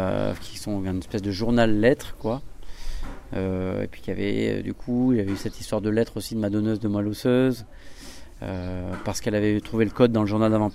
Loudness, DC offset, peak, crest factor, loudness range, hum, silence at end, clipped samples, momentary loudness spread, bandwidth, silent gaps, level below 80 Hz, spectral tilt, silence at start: -25 LUFS; under 0.1%; -6 dBFS; 20 dB; 3 LU; none; 0 s; under 0.1%; 14 LU; 15.5 kHz; none; -40 dBFS; -6.5 dB/octave; 0 s